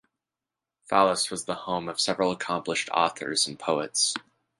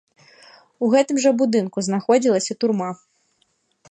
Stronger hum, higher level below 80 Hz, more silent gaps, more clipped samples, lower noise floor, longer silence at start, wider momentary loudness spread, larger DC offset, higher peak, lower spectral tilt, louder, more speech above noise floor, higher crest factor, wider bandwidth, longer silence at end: neither; first, -66 dBFS vs -72 dBFS; neither; neither; first, -89 dBFS vs -67 dBFS; about the same, 0.9 s vs 0.8 s; about the same, 7 LU vs 8 LU; neither; about the same, -6 dBFS vs -4 dBFS; second, -2 dB/octave vs -5 dB/octave; second, -26 LUFS vs -20 LUFS; first, 62 dB vs 48 dB; first, 22 dB vs 16 dB; first, 11.5 kHz vs 10 kHz; second, 0.4 s vs 0.95 s